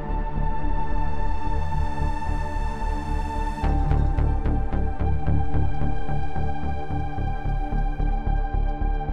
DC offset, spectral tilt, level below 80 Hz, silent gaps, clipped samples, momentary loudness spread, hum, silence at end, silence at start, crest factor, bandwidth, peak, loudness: 3%; -8.5 dB/octave; -26 dBFS; none; under 0.1%; 5 LU; none; 0 s; 0 s; 14 dB; 6.4 kHz; -10 dBFS; -28 LUFS